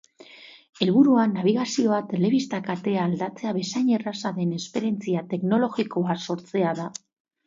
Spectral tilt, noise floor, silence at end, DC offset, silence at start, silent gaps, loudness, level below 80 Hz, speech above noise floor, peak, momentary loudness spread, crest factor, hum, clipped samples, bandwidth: -6 dB/octave; -48 dBFS; 0.5 s; under 0.1%; 0.3 s; none; -24 LUFS; -70 dBFS; 25 dB; -6 dBFS; 9 LU; 18 dB; none; under 0.1%; 7.8 kHz